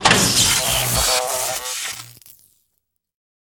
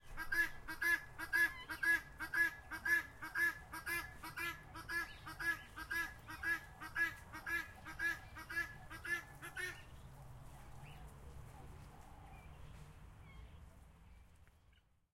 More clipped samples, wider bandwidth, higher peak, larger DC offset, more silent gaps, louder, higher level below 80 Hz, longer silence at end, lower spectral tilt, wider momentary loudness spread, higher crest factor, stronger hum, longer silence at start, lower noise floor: neither; first, 19.5 kHz vs 16.5 kHz; first, -2 dBFS vs -24 dBFS; neither; neither; first, -17 LUFS vs -40 LUFS; first, -40 dBFS vs -60 dBFS; first, 1.4 s vs 0.4 s; about the same, -1.5 dB/octave vs -2.5 dB/octave; second, 13 LU vs 22 LU; about the same, 20 dB vs 20 dB; neither; about the same, 0 s vs 0.05 s; about the same, -73 dBFS vs -71 dBFS